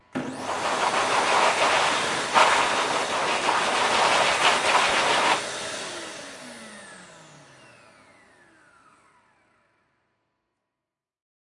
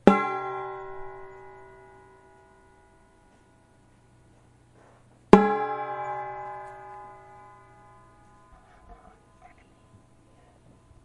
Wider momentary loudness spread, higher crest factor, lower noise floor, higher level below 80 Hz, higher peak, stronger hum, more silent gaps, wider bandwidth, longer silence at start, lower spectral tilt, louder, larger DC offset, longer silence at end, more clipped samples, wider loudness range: second, 19 LU vs 31 LU; second, 22 dB vs 30 dB; first, -87 dBFS vs -59 dBFS; second, -64 dBFS vs -54 dBFS; second, -4 dBFS vs 0 dBFS; neither; neither; about the same, 11.5 kHz vs 11 kHz; about the same, 0.15 s vs 0.05 s; second, -1 dB/octave vs -7.5 dB/octave; first, -22 LUFS vs -25 LUFS; neither; first, 4.35 s vs 2.1 s; neither; second, 17 LU vs 21 LU